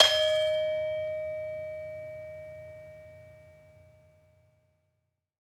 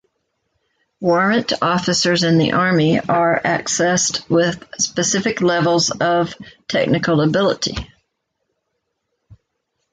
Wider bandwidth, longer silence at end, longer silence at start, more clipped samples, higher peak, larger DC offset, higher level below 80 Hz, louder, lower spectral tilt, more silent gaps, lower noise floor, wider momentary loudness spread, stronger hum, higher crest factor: first, 14 kHz vs 9.6 kHz; first, 2 s vs 0.6 s; second, 0 s vs 1 s; neither; about the same, -2 dBFS vs -4 dBFS; neither; second, -70 dBFS vs -48 dBFS; second, -30 LUFS vs -17 LUFS; second, -1 dB/octave vs -4 dB/octave; neither; first, -80 dBFS vs -74 dBFS; first, 23 LU vs 6 LU; neither; first, 30 dB vs 14 dB